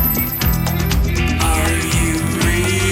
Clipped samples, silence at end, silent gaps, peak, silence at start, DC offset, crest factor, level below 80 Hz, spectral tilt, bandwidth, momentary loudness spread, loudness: under 0.1%; 0 s; none; -6 dBFS; 0 s; under 0.1%; 10 dB; -22 dBFS; -4.5 dB/octave; 16.5 kHz; 2 LU; -17 LUFS